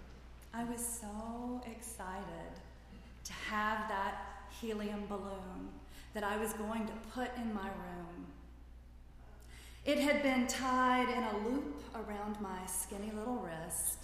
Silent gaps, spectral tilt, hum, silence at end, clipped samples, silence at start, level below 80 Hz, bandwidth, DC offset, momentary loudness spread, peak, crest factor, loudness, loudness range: none; -3.5 dB/octave; 60 Hz at -55 dBFS; 0 s; under 0.1%; 0 s; -56 dBFS; 15.5 kHz; under 0.1%; 23 LU; -20 dBFS; 20 dB; -38 LUFS; 8 LU